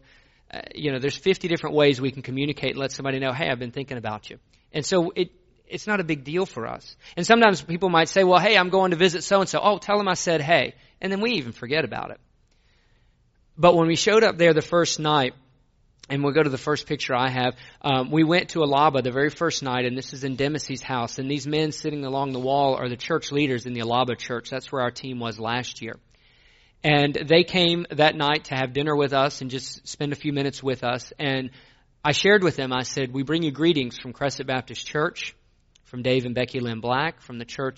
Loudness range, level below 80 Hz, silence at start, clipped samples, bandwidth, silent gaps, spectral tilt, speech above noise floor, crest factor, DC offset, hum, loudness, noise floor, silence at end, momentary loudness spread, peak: 7 LU; -56 dBFS; 0.55 s; under 0.1%; 8 kHz; none; -3.5 dB/octave; 38 dB; 22 dB; under 0.1%; none; -23 LUFS; -61 dBFS; 0.05 s; 13 LU; -2 dBFS